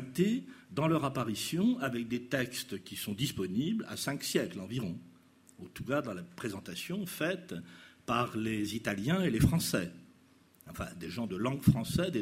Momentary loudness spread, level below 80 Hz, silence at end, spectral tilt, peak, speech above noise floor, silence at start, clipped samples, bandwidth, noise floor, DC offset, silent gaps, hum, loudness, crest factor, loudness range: 14 LU; -54 dBFS; 0 s; -5.5 dB/octave; -12 dBFS; 30 dB; 0 s; under 0.1%; 16 kHz; -63 dBFS; under 0.1%; none; none; -34 LUFS; 22 dB; 5 LU